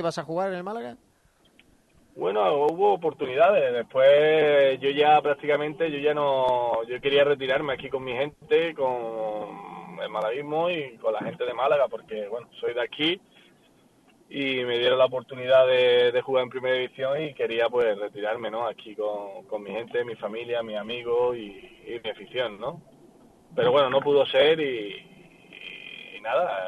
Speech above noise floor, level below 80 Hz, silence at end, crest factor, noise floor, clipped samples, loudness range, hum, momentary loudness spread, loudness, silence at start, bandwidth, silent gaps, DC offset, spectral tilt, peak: 38 dB; -66 dBFS; 0 s; 16 dB; -62 dBFS; under 0.1%; 9 LU; none; 16 LU; -25 LUFS; 0 s; 11.5 kHz; none; under 0.1%; -5.5 dB/octave; -8 dBFS